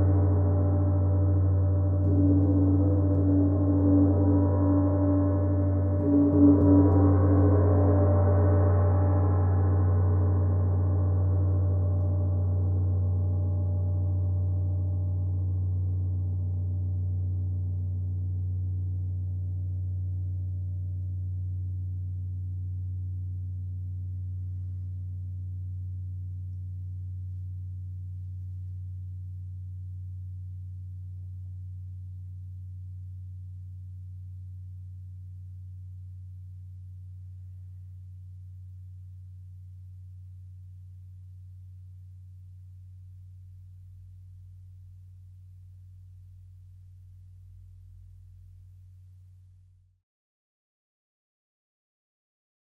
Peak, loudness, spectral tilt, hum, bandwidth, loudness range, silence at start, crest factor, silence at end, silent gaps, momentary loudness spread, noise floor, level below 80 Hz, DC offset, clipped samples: -8 dBFS; -27 LUFS; -13.5 dB/octave; none; 2 kHz; 24 LU; 0 s; 18 dB; 3.75 s; none; 23 LU; -58 dBFS; -60 dBFS; under 0.1%; under 0.1%